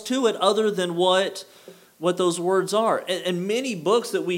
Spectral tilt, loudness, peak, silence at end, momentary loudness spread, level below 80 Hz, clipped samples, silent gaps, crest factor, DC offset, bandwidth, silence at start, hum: -4 dB/octave; -23 LUFS; -6 dBFS; 0 s; 6 LU; -84 dBFS; under 0.1%; none; 18 dB; under 0.1%; 16.5 kHz; 0 s; none